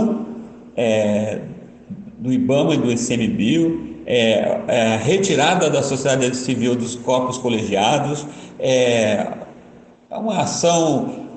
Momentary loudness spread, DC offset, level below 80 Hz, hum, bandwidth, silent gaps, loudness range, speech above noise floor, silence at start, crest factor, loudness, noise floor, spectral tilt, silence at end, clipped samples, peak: 15 LU; under 0.1%; -56 dBFS; none; 9.2 kHz; none; 3 LU; 27 dB; 0 s; 16 dB; -19 LUFS; -45 dBFS; -4.5 dB/octave; 0 s; under 0.1%; -4 dBFS